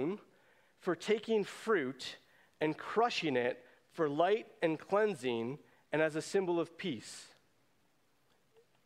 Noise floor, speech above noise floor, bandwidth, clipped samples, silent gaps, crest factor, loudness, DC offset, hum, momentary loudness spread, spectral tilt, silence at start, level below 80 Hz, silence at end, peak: -75 dBFS; 41 dB; 13.5 kHz; under 0.1%; none; 20 dB; -35 LUFS; under 0.1%; none; 14 LU; -5 dB/octave; 0 s; -82 dBFS; 1.6 s; -16 dBFS